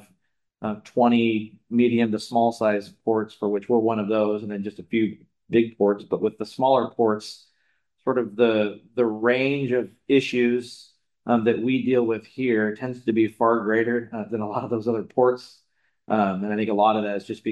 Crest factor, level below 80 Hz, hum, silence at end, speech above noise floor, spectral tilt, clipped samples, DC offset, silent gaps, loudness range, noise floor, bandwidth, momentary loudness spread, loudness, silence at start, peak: 18 dB; -70 dBFS; none; 0 s; 48 dB; -7 dB/octave; under 0.1%; under 0.1%; none; 2 LU; -71 dBFS; 11.5 kHz; 8 LU; -23 LUFS; 0.6 s; -6 dBFS